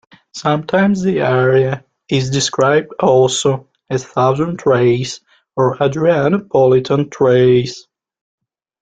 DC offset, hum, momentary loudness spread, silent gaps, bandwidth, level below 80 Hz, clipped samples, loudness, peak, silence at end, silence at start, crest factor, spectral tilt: under 0.1%; none; 11 LU; none; 9.2 kHz; -52 dBFS; under 0.1%; -15 LUFS; -2 dBFS; 1 s; 0.35 s; 14 dB; -5.5 dB/octave